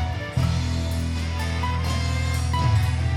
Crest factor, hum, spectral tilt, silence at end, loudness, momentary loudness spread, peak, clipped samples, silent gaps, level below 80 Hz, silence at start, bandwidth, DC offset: 12 dB; none; -5.5 dB/octave; 0 s; -24 LUFS; 5 LU; -10 dBFS; under 0.1%; none; -30 dBFS; 0 s; 14 kHz; under 0.1%